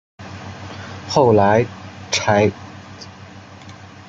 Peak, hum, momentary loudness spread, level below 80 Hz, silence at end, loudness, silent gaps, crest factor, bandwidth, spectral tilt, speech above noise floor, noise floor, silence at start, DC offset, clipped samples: -2 dBFS; none; 25 LU; -56 dBFS; 0.35 s; -17 LUFS; none; 18 dB; 9.2 kHz; -5 dB/octave; 24 dB; -39 dBFS; 0.2 s; under 0.1%; under 0.1%